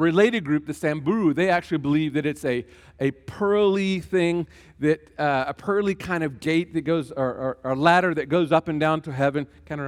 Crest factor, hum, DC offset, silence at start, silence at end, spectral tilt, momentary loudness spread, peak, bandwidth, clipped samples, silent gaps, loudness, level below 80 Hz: 18 dB; none; under 0.1%; 0 s; 0 s; -6.5 dB/octave; 8 LU; -4 dBFS; 13.5 kHz; under 0.1%; none; -23 LUFS; -56 dBFS